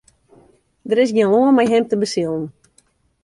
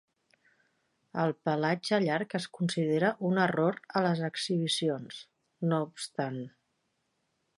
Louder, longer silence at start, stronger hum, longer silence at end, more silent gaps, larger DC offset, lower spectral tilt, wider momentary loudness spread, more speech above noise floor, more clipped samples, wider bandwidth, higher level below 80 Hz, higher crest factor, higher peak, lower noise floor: first, -17 LUFS vs -30 LUFS; second, 0.85 s vs 1.15 s; neither; second, 0.75 s vs 1.1 s; neither; neither; about the same, -5.5 dB/octave vs -5.5 dB/octave; first, 14 LU vs 10 LU; second, 43 dB vs 48 dB; neither; about the same, 11.5 kHz vs 11.5 kHz; first, -60 dBFS vs -78 dBFS; about the same, 16 dB vs 20 dB; first, -4 dBFS vs -12 dBFS; second, -59 dBFS vs -78 dBFS